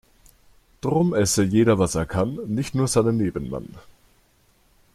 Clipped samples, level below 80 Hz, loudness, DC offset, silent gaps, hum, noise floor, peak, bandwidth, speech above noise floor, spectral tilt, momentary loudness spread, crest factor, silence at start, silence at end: under 0.1%; -46 dBFS; -22 LUFS; under 0.1%; none; none; -60 dBFS; -6 dBFS; 15 kHz; 39 dB; -5.5 dB/octave; 12 LU; 18 dB; 0.85 s; 1.15 s